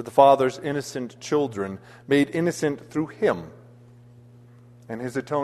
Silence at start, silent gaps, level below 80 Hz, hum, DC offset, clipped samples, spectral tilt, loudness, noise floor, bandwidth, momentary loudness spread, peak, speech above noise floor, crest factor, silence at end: 0 s; none; -64 dBFS; none; under 0.1%; under 0.1%; -5.5 dB/octave; -24 LUFS; -50 dBFS; 13.5 kHz; 16 LU; -2 dBFS; 26 dB; 22 dB; 0 s